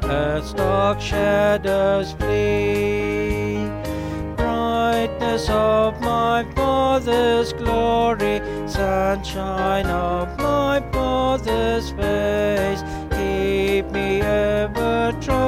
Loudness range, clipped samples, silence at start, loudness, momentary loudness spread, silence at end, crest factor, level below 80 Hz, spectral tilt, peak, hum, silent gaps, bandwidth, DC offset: 2 LU; under 0.1%; 0 s; -20 LUFS; 6 LU; 0 s; 14 dB; -32 dBFS; -6 dB/octave; -6 dBFS; none; none; 16 kHz; under 0.1%